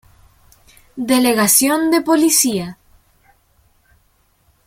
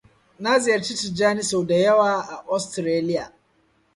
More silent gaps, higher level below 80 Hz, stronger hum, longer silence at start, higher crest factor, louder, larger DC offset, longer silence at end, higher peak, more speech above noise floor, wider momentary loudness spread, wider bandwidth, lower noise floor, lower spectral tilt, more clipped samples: neither; first, -56 dBFS vs -62 dBFS; neither; first, 0.95 s vs 0.4 s; about the same, 18 dB vs 16 dB; first, -14 LUFS vs -22 LUFS; neither; first, 1.95 s vs 0.65 s; first, 0 dBFS vs -6 dBFS; about the same, 44 dB vs 42 dB; first, 16 LU vs 9 LU; first, 16.5 kHz vs 11.5 kHz; second, -59 dBFS vs -63 dBFS; second, -2.5 dB/octave vs -4 dB/octave; neither